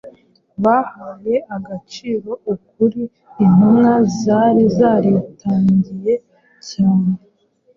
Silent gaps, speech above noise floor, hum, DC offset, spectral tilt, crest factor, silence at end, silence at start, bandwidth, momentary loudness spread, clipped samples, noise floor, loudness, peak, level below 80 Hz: none; 32 dB; none; under 0.1%; -8 dB/octave; 14 dB; 0.6 s; 0.05 s; 7.2 kHz; 16 LU; under 0.1%; -48 dBFS; -16 LUFS; -2 dBFS; -52 dBFS